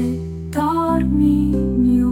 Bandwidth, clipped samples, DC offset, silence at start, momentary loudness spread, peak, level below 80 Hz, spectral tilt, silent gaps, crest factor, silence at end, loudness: 15.5 kHz; under 0.1%; under 0.1%; 0 s; 8 LU; -6 dBFS; -28 dBFS; -8.5 dB/octave; none; 12 dB; 0 s; -18 LUFS